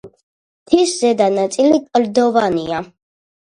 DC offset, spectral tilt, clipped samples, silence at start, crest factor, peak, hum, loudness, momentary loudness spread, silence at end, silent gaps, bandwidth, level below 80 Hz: under 0.1%; -4.5 dB/octave; under 0.1%; 0.05 s; 16 dB; 0 dBFS; none; -16 LUFS; 6 LU; 0.55 s; 0.23-0.66 s; 11 kHz; -54 dBFS